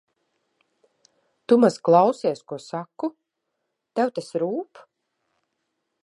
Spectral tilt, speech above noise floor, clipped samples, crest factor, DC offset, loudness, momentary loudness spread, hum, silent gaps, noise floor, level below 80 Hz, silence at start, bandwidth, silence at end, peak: -6.5 dB/octave; 57 dB; under 0.1%; 22 dB; under 0.1%; -23 LUFS; 16 LU; none; none; -79 dBFS; -80 dBFS; 1.5 s; 11.5 kHz; 1.4 s; -4 dBFS